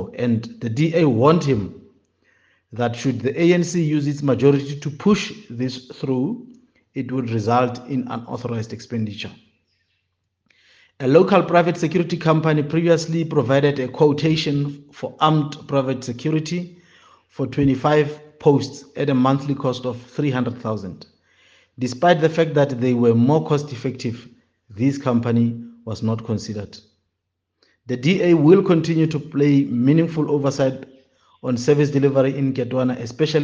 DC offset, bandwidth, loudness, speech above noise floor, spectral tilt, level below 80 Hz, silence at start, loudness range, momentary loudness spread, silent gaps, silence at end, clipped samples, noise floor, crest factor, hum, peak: under 0.1%; 7.8 kHz; -20 LUFS; 58 dB; -7 dB/octave; -58 dBFS; 0 s; 6 LU; 13 LU; none; 0 s; under 0.1%; -77 dBFS; 20 dB; none; 0 dBFS